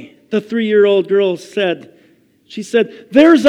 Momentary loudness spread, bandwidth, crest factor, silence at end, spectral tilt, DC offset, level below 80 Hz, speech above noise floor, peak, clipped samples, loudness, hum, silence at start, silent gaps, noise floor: 12 LU; 11.5 kHz; 14 dB; 0 s; -5.5 dB/octave; under 0.1%; -62 dBFS; 39 dB; 0 dBFS; 0.1%; -15 LUFS; none; 0 s; none; -52 dBFS